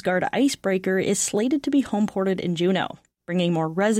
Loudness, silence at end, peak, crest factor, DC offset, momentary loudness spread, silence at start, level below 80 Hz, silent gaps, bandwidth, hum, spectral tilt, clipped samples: -23 LUFS; 0 s; -12 dBFS; 12 dB; under 0.1%; 4 LU; 0.05 s; -60 dBFS; none; 16 kHz; none; -5 dB/octave; under 0.1%